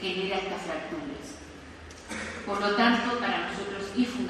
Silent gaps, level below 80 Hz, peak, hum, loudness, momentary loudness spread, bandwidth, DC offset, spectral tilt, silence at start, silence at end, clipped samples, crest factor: none; -56 dBFS; -10 dBFS; none; -29 LUFS; 21 LU; 12.5 kHz; under 0.1%; -4 dB/octave; 0 s; 0 s; under 0.1%; 20 dB